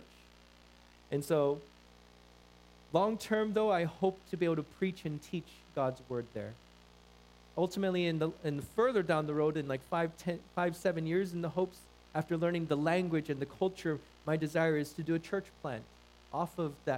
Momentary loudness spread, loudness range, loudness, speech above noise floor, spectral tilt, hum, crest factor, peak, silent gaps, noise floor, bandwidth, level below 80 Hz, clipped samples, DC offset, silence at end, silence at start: 10 LU; 4 LU; -35 LUFS; 26 dB; -6.5 dB/octave; 60 Hz at -60 dBFS; 22 dB; -14 dBFS; none; -60 dBFS; 16 kHz; -64 dBFS; under 0.1%; under 0.1%; 0 s; 0 s